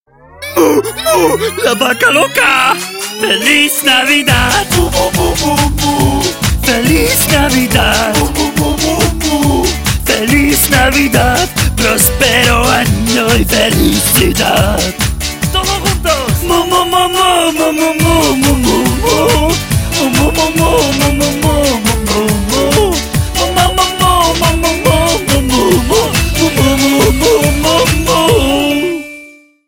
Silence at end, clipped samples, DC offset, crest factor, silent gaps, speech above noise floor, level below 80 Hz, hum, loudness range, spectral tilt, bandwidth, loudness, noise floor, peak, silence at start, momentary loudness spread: 0.4 s; under 0.1%; under 0.1%; 10 dB; none; 27 dB; -20 dBFS; none; 2 LU; -3.5 dB/octave; 17 kHz; -10 LUFS; -37 dBFS; 0 dBFS; 0.35 s; 5 LU